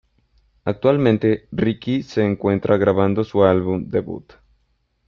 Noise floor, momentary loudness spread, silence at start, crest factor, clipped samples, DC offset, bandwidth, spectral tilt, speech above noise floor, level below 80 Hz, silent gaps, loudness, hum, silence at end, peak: -66 dBFS; 9 LU; 0.65 s; 18 dB; under 0.1%; under 0.1%; 7 kHz; -8.5 dB/octave; 48 dB; -52 dBFS; none; -19 LUFS; none; 0.85 s; -2 dBFS